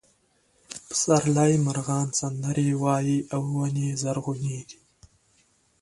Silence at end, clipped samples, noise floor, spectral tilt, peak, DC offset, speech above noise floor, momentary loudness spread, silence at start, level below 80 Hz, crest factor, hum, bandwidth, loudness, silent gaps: 1.1 s; under 0.1%; -66 dBFS; -5.5 dB/octave; -6 dBFS; under 0.1%; 41 dB; 11 LU; 0.7 s; -62 dBFS; 20 dB; none; 11.5 kHz; -25 LUFS; none